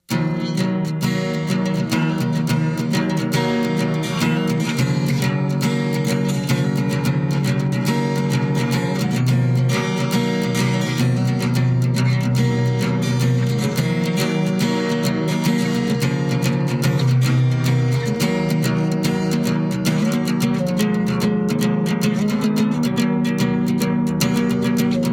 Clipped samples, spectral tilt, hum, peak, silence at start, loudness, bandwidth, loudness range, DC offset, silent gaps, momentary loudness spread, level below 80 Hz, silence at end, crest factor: under 0.1%; -6 dB/octave; none; -4 dBFS; 0.1 s; -19 LUFS; 17 kHz; 1 LU; under 0.1%; none; 2 LU; -50 dBFS; 0 s; 14 dB